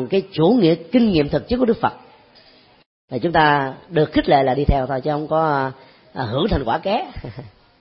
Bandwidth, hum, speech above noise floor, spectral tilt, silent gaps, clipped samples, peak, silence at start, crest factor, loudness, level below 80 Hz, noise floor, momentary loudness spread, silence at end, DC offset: 5.8 kHz; none; 32 dB; -11.5 dB/octave; 2.86-3.08 s; under 0.1%; -2 dBFS; 0 s; 16 dB; -19 LUFS; -36 dBFS; -50 dBFS; 13 LU; 0.3 s; under 0.1%